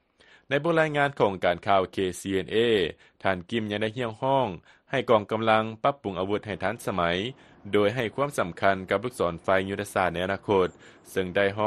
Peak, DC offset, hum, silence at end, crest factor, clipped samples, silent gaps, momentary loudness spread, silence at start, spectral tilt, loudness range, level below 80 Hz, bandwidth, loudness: -6 dBFS; under 0.1%; none; 0 s; 20 dB; under 0.1%; none; 7 LU; 0.5 s; -5.5 dB/octave; 2 LU; -58 dBFS; 13 kHz; -26 LUFS